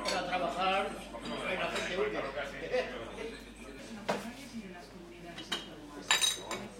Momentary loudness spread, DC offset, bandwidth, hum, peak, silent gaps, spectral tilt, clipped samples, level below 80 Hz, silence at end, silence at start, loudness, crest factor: 17 LU; under 0.1%; 16.5 kHz; none; -8 dBFS; none; -2 dB/octave; under 0.1%; -58 dBFS; 0 s; 0 s; -34 LUFS; 28 dB